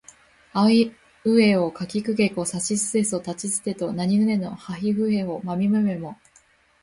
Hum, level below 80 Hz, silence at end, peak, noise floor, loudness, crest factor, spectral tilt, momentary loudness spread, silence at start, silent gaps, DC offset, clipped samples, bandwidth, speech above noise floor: none; -60 dBFS; 0.7 s; -6 dBFS; -58 dBFS; -23 LUFS; 16 dB; -5 dB/octave; 10 LU; 0.55 s; none; under 0.1%; under 0.1%; 11.5 kHz; 36 dB